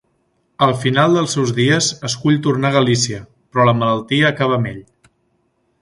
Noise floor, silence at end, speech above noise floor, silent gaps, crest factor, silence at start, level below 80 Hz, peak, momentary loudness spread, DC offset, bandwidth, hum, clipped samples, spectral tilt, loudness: -64 dBFS; 1 s; 49 dB; none; 16 dB; 0.6 s; -52 dBFS; 0 dBFS; 7 LU; under 0.1%; 11.5 kHz; none; under 0.1%; -5 dB/octave; -16 LUFS